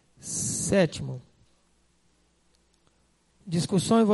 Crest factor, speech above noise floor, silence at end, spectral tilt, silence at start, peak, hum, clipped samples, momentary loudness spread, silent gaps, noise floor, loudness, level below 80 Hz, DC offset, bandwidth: 18 dB; 43 dB; 0 s; -5 dB/octave; 0.25 s; -10 dBFS; none; under 0.1%; 16 LU; none; -67 dBFS; -26 LUFS; -58 dBFS; under 0.1%; 11.5 kHz